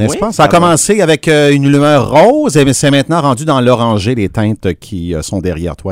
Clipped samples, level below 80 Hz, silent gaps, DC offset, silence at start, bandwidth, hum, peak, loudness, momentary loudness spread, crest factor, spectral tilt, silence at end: 0.7%; -36 dBFS; none; under 0.1%; 0 s; 16 kHz; none; 0 dBFS; -10 LUFS; 10 LU; 10 dB; -5 dB/octave; 0 s